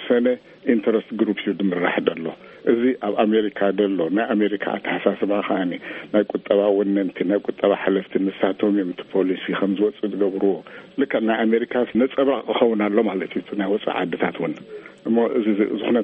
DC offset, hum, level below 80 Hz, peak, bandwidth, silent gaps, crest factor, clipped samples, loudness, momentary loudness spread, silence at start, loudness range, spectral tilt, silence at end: under 0.1%; none; -66 dBFS; -2 dBFS; 4.4 kHz; none; 18 dB; under 0.1%; -21 LUFS; 7 LU; 0 s; 1 LU; -4.5 dB/octave; 0 s